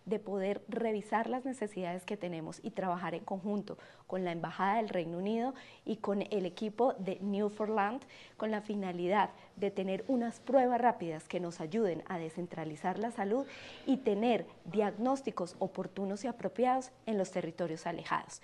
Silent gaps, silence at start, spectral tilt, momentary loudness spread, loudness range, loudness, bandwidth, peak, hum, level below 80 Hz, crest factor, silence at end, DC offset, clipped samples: none; 0.05 s; -6.5 dB/octave; 8 LU; 4 LU; -35 LUFS; 12 kHz; -14 dBFS; none; -76 dBFS; 20 dB; 0.05 s; under 0.1%; under 0.1%